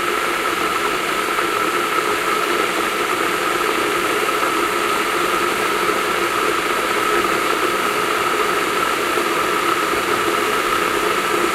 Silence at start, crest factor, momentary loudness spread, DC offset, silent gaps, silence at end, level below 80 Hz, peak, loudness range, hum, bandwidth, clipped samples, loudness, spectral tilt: 0 s; 14 dB; 1 LU; under 0.1%; none; 0 s; -50 dBFS; -4 dBFS; 1 LU; none; 16 kHz; under 0.1%; -18 LUFS; -2 dB/octave